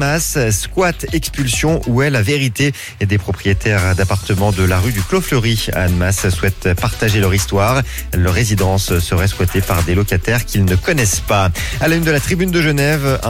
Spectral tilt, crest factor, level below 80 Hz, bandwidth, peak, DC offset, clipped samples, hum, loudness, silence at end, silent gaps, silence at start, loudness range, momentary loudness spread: -5 dB/octave; 12 dB; -26 dBFS; 17 kHz; -4 dBFS; under 0.1%; under 0.1%; none; -15 LUFS; 0 s; none; 0 s; 1 LU; 3 LU